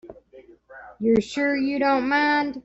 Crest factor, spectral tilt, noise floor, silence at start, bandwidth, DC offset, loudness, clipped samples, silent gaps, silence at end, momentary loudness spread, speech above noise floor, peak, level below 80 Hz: 16 dB; -5.5 dB/octave; -50 dBFS; 0.05 s; 8 kHz; under 0.1%; -22 LUFS; under 0.1%; none; 0.05 s; 3 LU; 28 dB; -8 dBFS; -58 dBFS